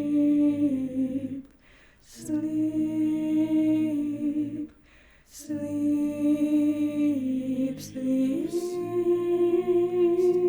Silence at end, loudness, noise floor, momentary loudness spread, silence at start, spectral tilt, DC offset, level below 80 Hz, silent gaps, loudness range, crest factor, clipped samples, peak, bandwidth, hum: 0 s; -26 LUFS; -56 dBFS; 10 LU; 0 s; -7 dB/octave; under 0.1%; -62 dBFS; none; 2 LU; 10 dB; under 0.1%; -14 dBFS; over 20 kHz; none